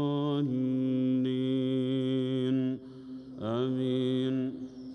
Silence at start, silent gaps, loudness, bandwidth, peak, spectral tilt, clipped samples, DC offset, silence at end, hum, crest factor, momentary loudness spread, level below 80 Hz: 0 s; none; -30 LUFS; 6 kHz; -20 dBFS; -9 dB/octave; under 0.1%; under 0.1%; 0 s; none; 10 dB; 11 LU; -72 dBFS